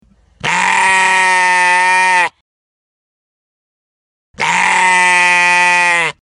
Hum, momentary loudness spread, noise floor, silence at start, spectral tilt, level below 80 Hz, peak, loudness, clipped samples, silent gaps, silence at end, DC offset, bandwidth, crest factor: none; 7 LU; under -90 dBFS; 0.45 s; -0.5 dB/octave; -56 dBFS; 0 dBFS; -10 LUFS; under 0.1%; 2.41-4.34 s; 0.1 s; under 0.1%; 11.5 kHz; 14 dB